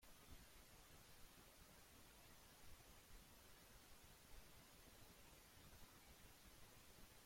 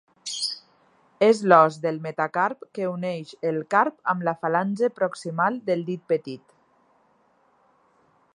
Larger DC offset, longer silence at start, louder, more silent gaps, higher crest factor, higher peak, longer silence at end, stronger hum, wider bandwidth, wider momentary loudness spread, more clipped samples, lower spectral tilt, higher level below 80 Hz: neither; second, 0 s vs 0.25 s; second, -66 LUFS vs -24 LUFS; neither; second, 16 dB vs 24 dB; second, -48 dBFS vs -2 dBFS; second, 0 s vs 2 s; neither; first, 16.5 kHz vs 11.5 kHz; second, 1 LU vs 13 LU; neither; second, -3 dB/octave vs -5 dB/octave; first, -72 dBFS vs -78 dBFS